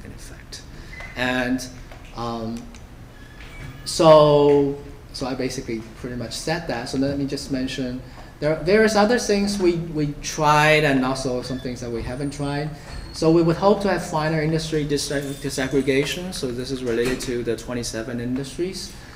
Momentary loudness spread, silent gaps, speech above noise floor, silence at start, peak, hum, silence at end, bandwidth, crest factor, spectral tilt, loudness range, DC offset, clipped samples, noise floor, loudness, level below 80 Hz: 19 LU; none; 20 dB; 0 s; -2 dBFS; none; 0 s; 16 kHz; 20 dB; -5 dB/octave; 7 LU; under 0.1%; under 0.1%; -41 dBFS; -21 LUFS; -42 dBFS